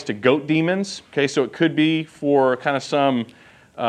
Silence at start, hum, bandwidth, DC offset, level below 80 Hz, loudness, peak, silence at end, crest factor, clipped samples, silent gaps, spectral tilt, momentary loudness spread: 0 s; none; 10 kHz; under 0.1%; -68 dBFS; -20 LUFS; -2 dBFS; 0 s; 18 dB; under 0.1%; none; -5.5 dB/octave; 7 LU